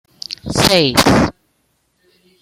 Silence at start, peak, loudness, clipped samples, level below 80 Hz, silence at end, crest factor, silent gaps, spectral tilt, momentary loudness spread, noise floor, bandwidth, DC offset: 0.3 s; 0 dBFS; -13 LUFS; under 0.1%; -38 dBFS; 1.1 s; 16 dB; none; -4 dB/octave; 15 LU; -64 dBFS; 16.5 kHz; under 0.1%